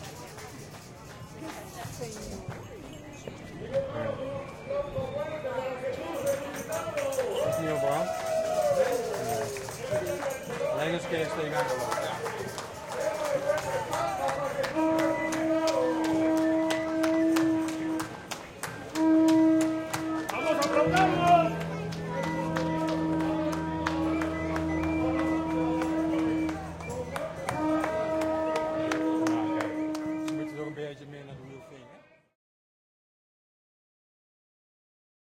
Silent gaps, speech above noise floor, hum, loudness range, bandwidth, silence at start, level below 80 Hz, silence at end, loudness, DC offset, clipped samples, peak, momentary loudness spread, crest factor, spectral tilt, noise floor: none; 23 dB; none; 10 LU; 16.5 kHz; 0 s; -56 dBFS; 3.35 s; -29 LUFS; under 0.1%; under 0.1%; -10 dBFS; 15 LU; 20 dB; -5.5 dB/octave; -55 dBFS